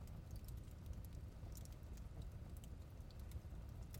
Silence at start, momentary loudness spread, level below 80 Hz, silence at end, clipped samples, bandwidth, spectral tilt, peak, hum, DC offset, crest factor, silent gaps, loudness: 0 s; 2 LU; -54 dBFS; 0 s; under 0.1%; 16.5 kHz; -6 dB/octave; -38 dBFS; none; under 0.1%; 16 dB; none; -55 LUFS